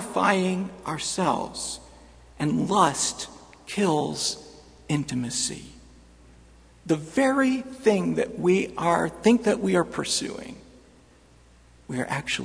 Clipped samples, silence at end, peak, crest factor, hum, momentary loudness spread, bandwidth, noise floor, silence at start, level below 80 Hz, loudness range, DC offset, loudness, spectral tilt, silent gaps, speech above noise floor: under 0.1%; 0 s; -4 dBFS; 22 dB; none; 13 LU; 11 kHz; -55 dBFS; 0 s; -54 dBFS; 6 LU; under 0.1%; -25 LUFS; -4 dB/octave; none; 30 dB